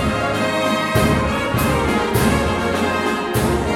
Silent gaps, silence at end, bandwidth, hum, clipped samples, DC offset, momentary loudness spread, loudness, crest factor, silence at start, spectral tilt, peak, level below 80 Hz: none; 0 s; 17.5 kHz; none; under 0.1%; under 0.1%; 3 LU; -18 LUFS; 14 dB; 0 s; -5 dB/octave; -4 dBFS; -32 dBFS